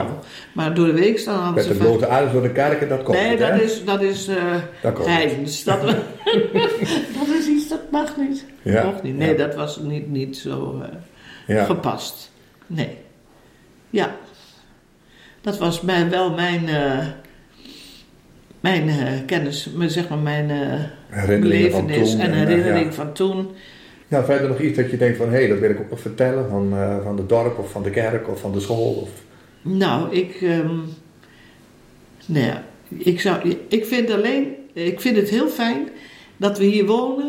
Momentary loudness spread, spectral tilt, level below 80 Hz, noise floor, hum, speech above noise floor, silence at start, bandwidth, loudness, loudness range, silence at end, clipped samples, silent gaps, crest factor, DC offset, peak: 11 LU; -6 dB/octave; -54 dBFS; -52 dBFS; none; 33 dB; 0 s; 16.5 kHz; -20 LUFS; 7 LU; 0 s; under 0.1%; none; 18 dB; under 0.1%; -4 dBFS